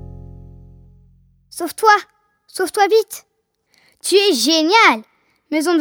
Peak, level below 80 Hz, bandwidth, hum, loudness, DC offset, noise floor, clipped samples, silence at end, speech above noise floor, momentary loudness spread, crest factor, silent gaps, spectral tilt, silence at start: 0 dBFS; -50 dBFS; 18.5 kHz; none; -15 LUFS; under 0.1%; -64 dBFS; under 0.1%; 0 s; 49 dB; 20 LU; 18 dB; none; -2 dB/octave; 0 s